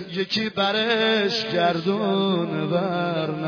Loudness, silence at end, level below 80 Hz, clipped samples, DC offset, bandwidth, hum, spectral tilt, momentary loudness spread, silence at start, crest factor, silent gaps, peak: -22 LUFS; 0 s; -66 dBFS; under 0.1%; under 0.1%; 5.4 kHz; none; -6 dB/octave; 4 LU; 0 s; 12 dB; none; -10 dBFS